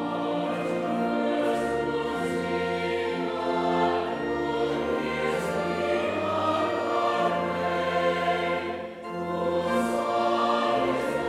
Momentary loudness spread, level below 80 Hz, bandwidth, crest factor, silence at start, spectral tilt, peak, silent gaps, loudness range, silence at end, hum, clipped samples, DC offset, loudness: 4 LU; -58 dBFS; 15 kHz; 14 dB; 0 s; -5.5 dB/octave; -12 dBFS; none; 1 LU; 0 s; none; under 0.1%; under 0.1%; -27 LUFS